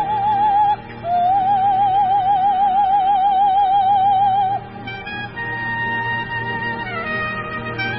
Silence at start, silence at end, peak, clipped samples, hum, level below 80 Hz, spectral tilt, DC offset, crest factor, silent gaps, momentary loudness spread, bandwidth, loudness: 0 s; 0 s; -8 dBFS; under 0.1%; none; -46 dBFS; -9 dB/octave; under 0.1%; 10 dB; none; 10 LU; 5.8 kHz; -18 LUFS